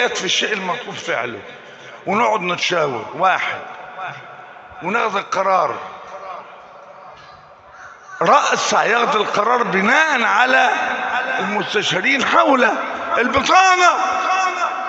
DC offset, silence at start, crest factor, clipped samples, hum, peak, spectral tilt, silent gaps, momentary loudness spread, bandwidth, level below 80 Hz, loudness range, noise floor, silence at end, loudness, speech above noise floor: under 0.1%; 0 s; 18 dB; under 0.1%; none; 0 dBFS; -2.5 dB/octave; none; 19 LU; 8.2 kHz; -60 dBFS; 8 LU; -42 dBFS; 0 s; -16 LUFS; 26 dB